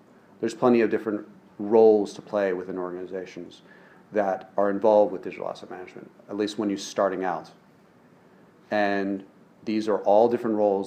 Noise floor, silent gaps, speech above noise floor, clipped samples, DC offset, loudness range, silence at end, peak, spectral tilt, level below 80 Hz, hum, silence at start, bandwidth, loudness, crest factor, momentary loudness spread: -56 dBFS; none; 32 dB; under 0.1%; under 0.1%; 6 LU; 0 s; -6 dBFS; -6 dB/octave; -76 dBFS; none; 0.4 s; 9.6 kHz; -25 LUFS; 20 dB; 17 LU